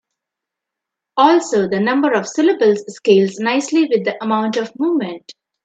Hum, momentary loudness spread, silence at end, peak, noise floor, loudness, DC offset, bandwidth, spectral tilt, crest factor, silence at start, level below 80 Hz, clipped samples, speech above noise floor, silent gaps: none; 7 LU; 0.35 s; 0 dBFS; -83 dBFS; -16 LUFS; under 0.1%; 9 kHz; -5 dB/octave; 16 dB; 1.15 s; -66 dBFS; under 0.1%; 67 dB; none